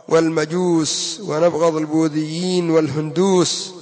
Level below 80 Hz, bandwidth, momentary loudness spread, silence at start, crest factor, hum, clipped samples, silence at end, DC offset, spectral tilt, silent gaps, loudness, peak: -62 dBFS; 8 kHz; 5 LU; 0.1 s; 14 dB; none; under 0.1%; 0 s; under 0.1%; -5 dB/octave; none; -18 LUFS; -4 dBFS